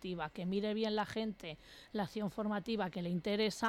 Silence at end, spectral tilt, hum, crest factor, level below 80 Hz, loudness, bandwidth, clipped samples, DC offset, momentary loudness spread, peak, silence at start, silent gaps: 0 s; -5.5 dB/octave; none; 14 dB; -66 dBFS; -38 LUFS; 15 kHz; under 0.1%; under 0.1%; 9 LU; -24 dBFS; 0 s; none